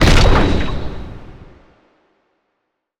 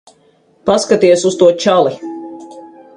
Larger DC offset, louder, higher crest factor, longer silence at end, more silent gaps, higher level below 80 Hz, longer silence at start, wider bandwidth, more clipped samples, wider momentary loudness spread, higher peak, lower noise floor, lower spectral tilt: neither; second, -16 LUFS vs -12 LUFS; about the same, 16 dB vs 14 dB; first, 1.7 s vs 0.3 s; neither; first, -20 dBFS vs -56 dBFS; second, 0 s vs 0.65 s; about the same, 12 kHz vs 11 kHz; neither; first, 23 LU vs 19 LU; about the same, 0 dBFS vs 0 dBFS; first, -73 dBFS vs -52 dBFS; about the same, -5.5 dB/octave vs -4.5 dB/octave